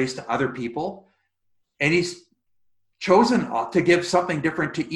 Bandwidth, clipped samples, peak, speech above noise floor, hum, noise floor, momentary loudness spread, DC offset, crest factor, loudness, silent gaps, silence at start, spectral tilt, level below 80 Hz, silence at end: 11.5 kHz; under 0.1%; -4 dBFS; 50 dB; none; -71 dBFS; 13 LU; under 0.1%; 20 dB; -22 LUFS; none; 0 s; -5 dB/octave; -60 dBFS; 0 s